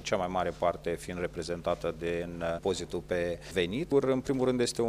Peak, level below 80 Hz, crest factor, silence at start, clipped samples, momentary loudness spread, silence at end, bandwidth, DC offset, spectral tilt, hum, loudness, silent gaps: -14 dBFS; -52 dBFS; 18 dB; 0 s; under 0.1%; 7 LU; 0 s; 15.5 kHz; under 0.1%; -5 dB/octave; none; -32 LUFS; none